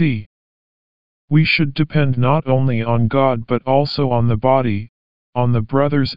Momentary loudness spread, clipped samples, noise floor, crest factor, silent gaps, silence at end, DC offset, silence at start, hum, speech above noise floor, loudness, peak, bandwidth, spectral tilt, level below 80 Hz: 5 LU; under 0.1%; under -90 dBFS; 16 dB; 0.26-1.28 s, 4.89-5.33 s; 0 s; 3%; 0 s; none; over 74 dB; -17 LUFS; -2 dBFS; 5.4 kHz; -6 dB/octave; -44 dBFS